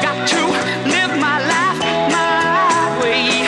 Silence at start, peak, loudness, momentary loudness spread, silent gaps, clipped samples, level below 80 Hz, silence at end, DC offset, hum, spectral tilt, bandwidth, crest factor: 0 s; -2 dBFS; -15 LUFS; 3 LU; none; under 0.1%; -54 dBFS; 0 s; under 0.1%; none; -3 dB/octave; 11.5 kHz; 14 dB